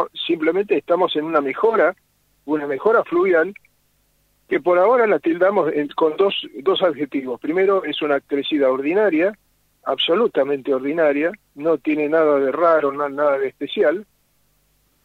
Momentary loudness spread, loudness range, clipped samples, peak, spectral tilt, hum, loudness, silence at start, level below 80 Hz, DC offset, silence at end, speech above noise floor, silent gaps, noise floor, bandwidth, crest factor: 7 LU; 2 LU; under 0.1%; -4 dBFS; -6.5 dB/octave; 50 Hz at -65 dBFS; -19 LUFS; 0 s; -68 dBFS; under 0.1%; 1 s; 45 dB; none; -63 dBFS; 5.6 kHz; 16 dB